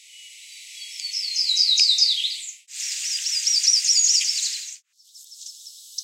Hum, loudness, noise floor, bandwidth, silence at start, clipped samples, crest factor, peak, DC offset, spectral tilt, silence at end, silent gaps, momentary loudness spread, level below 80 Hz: none; -18 LUFS; -50 dBFS; 16 kHz; 0.15 s; under 0.1%; 20 dB; -4 dBFS; under 0.1%; 15 dB/octave; 0 s; none; 23 LU; under -90 dBFS